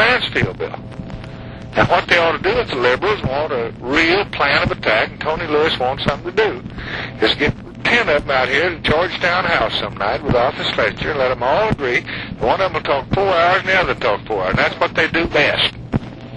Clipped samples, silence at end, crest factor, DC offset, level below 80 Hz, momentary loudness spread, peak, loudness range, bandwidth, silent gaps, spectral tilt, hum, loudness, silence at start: under 0.1%; 0 s; 16 dB; under 0.1%; -38 dBFS; 10 LU; -2 dBFS; 2 LU; 11 kHz; none; -5.5 dB/octave; none; -17 LUFS; 0 s